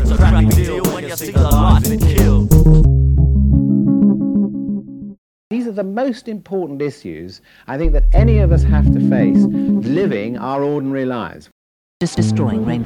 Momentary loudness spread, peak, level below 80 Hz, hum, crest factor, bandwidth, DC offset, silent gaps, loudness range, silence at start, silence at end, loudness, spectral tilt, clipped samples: 13 LU; 0 dBFS; -18 dBFS; none; 14 dB; 19 kHz; under 0.1%; 5.18-5.51 s, 11.52-12.00 s; 9 LU; 0 s; 0 s; -15 LUFS; -7.5 dB/octave; under 0.1%